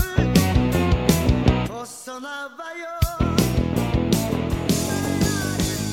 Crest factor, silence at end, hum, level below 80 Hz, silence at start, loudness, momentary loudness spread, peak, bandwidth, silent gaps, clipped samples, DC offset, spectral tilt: 20 dB; 0 s; none; -30 dBFS; 0 s; -21 LUFS; 13 LU; 0 dBFS; 17.5 kHz; none; under 0.1%; under 0.1%; -5.5 dB/octave